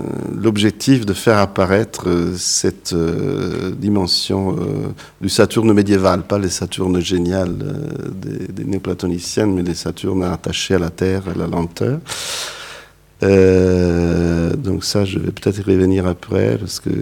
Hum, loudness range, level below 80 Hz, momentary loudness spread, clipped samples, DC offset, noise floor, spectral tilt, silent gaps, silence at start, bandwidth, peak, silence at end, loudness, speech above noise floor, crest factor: none; 4 LU; -40 dBFS; 10 LU; under 0.1%; under 0.1%; -40 dBFS; -5.5 dB/octave; none; 0 s; 18 kHz; 0 dBFS; 0 s; -17 LUFS; 23 dB; 16 dB